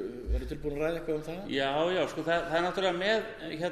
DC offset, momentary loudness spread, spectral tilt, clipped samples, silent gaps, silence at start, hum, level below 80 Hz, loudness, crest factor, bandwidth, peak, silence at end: under 0.1%; 7 LU; -5.5 dB/octave; under 0.1%; none; 0 s; none; -42 dBFS; -31 LUFS; 16 dB; 13.5 kHz; -14 dBFS; 0 s